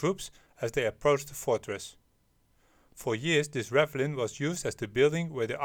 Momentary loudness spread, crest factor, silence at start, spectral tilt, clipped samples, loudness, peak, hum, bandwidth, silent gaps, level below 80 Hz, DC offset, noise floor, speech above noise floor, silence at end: 12 LU; 22 dB; 0 s; -4.5 dB/octave; under 0.1%; -30 LUFS; -8 dBFS; none; 18 kHz; none; -60 dBFS; under 0.1%; -69 dBFS; 39 dB; 0 s